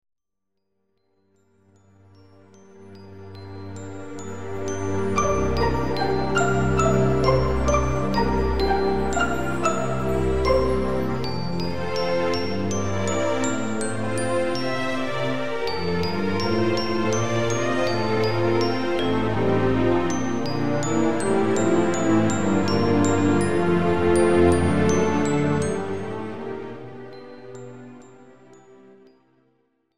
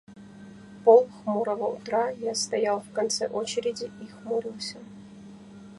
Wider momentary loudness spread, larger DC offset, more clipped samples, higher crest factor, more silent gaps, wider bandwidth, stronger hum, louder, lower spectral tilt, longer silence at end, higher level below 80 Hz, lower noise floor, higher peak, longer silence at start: second, 15 LU vs 27 LU; first, 3% vs under 0.1%; neither; about the same, 18 dB vs 22 dB; neither; first, 14 kHz vs 11.5 kHz; neither; first, -23 LUFS vs -26 LUFS; first, -6 dB/octave vs -3.5 dB/octave; about the same, 0 s vs 0 s; first, -38 dBFS vs -68 dBFS; first, -81 dBFS vs -46 dBFS; about the same, -6 dBFS vs -6 dBFS; about the same, 0 s vs 0.1 s